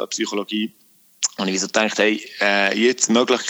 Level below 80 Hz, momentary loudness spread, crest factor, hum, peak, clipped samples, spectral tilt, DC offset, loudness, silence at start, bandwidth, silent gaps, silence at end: -72 dBFS; 8 LU; 18 dB; none; -4 dBFS; under 0.1%; -2.5 dB/octave; under 0.1%; -19 LUFS; 0 s; over 20 kHz; none; 0 s